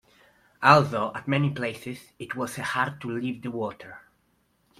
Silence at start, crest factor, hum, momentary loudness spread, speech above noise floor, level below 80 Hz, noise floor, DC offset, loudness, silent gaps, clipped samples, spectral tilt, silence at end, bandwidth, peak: 0.6 s; 26 dB; none; 20 LU; 42 dB; -64 dBFS; -68 dBFS; under 0.1%; -25 LUFS; none; under 0.1%; -6 dB/octave; 0.8 s; 15 kHz; -2 dBFS